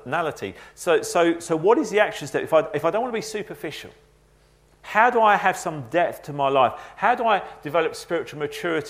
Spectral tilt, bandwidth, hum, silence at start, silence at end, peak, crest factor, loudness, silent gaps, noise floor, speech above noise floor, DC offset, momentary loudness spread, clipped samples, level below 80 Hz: -4.5 dB/octave; 16 kHz; 60 Hz at -65 dBFS; 0.05 s; 0 s; -2 dBFS; 20 dB; -22 LUFS; none; -57 dBFS; 35 dB; under 0.1%; 12 LU; under 0.1%; -60 dBFS